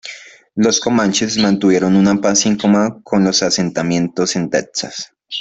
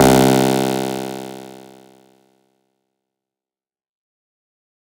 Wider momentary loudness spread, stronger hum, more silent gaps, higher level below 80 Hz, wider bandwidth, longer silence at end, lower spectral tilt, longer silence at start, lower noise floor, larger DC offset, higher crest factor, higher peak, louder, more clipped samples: second, 13 LU vs 23 LU; neither; neither; second, -52 dBFS vs -46 dBFS; second, 8.2 kHz vs 17.5 kHz; second, 0 s vs 3.3 s; about the same, -4 dB/octave vs -5 dB/octave; about the same, 0.05 s vs 0 s; second, -36 dBFS vs under -90 dBFS; neither; second, 14 dB vs 20 dB; about the same, -2 dBFS vs 0 dBFS; about the same, -15 LUFS vs -17 LUFS; neither